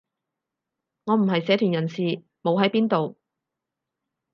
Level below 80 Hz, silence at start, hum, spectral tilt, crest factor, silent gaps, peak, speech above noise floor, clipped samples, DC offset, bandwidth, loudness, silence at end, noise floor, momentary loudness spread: -76 dBFS; 1.05 s; none; -8 dB/octave; 20 dB; none; -6 dBFS; 63 dB; under 0.1%; under 0.1%; 6.6 kHz; -23 LUFS; 1.2 s; -85 dBFS; 7 LU